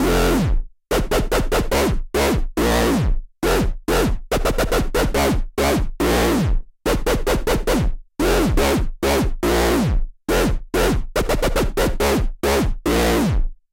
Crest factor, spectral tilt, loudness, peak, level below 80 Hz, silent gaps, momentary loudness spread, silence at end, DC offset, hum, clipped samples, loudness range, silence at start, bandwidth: 12 dB; -5 dB/octave; -20 LUFS; -6 dBFS; -24 dBFS; none; 5 LU; 0.2 s; under 0.1%; none; under 0.1%; 1 LU; 0 s; 17 kHz